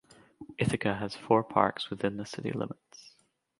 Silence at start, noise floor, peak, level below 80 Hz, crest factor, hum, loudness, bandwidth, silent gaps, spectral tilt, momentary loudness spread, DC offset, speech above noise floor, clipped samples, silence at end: 0.4 s; -69 dBFS; -6 dBFS; -62 dBFS; 26 dB; none; -31 LUFS; 11.5 kHz; none; -6 dB/octave; 15 LU; under 0.1%; 39 dB; under 0.1%; 0.5 s